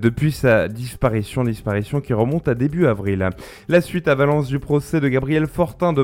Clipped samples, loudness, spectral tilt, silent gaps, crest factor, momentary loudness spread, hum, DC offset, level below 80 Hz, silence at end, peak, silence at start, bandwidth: under 0.1%; -20 LUFS; -7.5 dB/octave; none; 16 dB; 6 LU; none; under 0.1%; -40 dBFS; 0 s; -2 dBFS; 0 s; 16.5 kHz